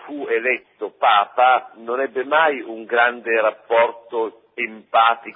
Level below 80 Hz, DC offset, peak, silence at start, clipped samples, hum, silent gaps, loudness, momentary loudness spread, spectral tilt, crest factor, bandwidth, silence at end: -80 dBFS; under 0.1%; -4 dBFS; 0.05 s; under 0.1%; none; none; -19 LUFS; 11 LU; -7.5 dB/octave; 16 dB; 4 kHz; 0.05 s